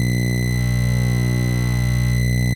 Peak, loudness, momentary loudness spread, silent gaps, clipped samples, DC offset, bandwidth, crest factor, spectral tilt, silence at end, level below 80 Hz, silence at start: -8 dBFS; -19 LUFS; 1 LU; none; under 0.1%; under 0.1%; 17 kHz; 10 dB; -6 dB/octave; 0 s; -26 dBFS; 0 s